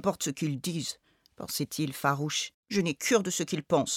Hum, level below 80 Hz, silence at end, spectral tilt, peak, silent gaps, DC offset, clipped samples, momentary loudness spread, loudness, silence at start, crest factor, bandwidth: none; -68 dBFS; 0 s; -4 dB/octave; -12 dBFS; 2.54-2.63 s; under 0.1%; under 0.1%; 9 LU; -30 LUFS; 0 s; 20 dB; 17.5 kHz